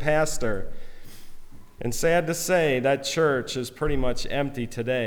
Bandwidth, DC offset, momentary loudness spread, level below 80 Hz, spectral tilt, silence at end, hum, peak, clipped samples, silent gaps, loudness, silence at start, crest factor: 18 kHz; under 0.1%; 9 LU; -36 dBFS; -4.5 dB/octave; 0 s; none; -10 dBFS; under 0.1%; none; -25 LUFS; 0 s; 14 dB